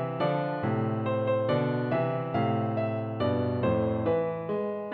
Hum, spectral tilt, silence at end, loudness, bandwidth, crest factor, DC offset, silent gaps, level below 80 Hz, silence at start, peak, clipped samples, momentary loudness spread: none; -10.5 dB/octave; 0 s; -28 LUFS; 5 kHz; 14 dB; under 0.1%; none; -60 dBFS; 0 s; -14 dBFS; under 0.1%; 4 LU